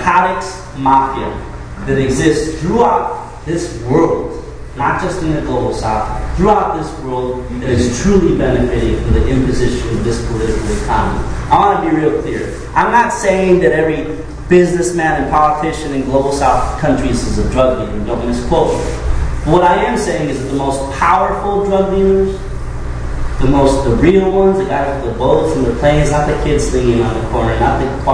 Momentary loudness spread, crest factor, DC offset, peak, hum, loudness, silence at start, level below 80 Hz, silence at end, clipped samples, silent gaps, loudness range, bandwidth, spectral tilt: 10 LU; 14 dB; under 0.1%; 0 dBFS; none; -14 LUFS; 0 s; -22 dBFS; 0 s; under 0.1%; none; 3 LU; 10.5 kHz; -6 dB/octave